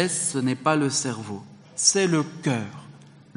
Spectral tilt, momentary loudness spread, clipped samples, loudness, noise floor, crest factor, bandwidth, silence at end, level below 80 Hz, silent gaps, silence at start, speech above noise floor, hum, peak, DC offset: -3.5 dB/octave; 18 LU; under 0.1%; -23 LUFS; -48 dBFS; 20 dB; 11 kHz; 0.3 s; -70 dBFS; none; 0 s; 24 dB; none; -6 dBFS; under 0.1%